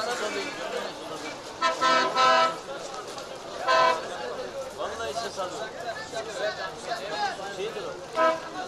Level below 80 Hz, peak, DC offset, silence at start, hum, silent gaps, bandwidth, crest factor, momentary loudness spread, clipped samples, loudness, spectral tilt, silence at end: -62 dBFS; -10 dBFS; under 0.1%; 0 s; none; none; 14.5 kHz; 18 dB; 14 LU; under 0.1%; -28 LUFS; -2 dB/octave; 0 s